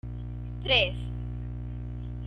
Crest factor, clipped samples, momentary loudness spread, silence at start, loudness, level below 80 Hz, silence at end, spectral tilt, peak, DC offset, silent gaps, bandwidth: 22 dB; under 0.1%; 15 LU; 0.05 s; -30 LUFS; -38 dBFS; 0 s; -6 dB/octave; -10 dBFS; under 0.1%; none; 6.6 kHz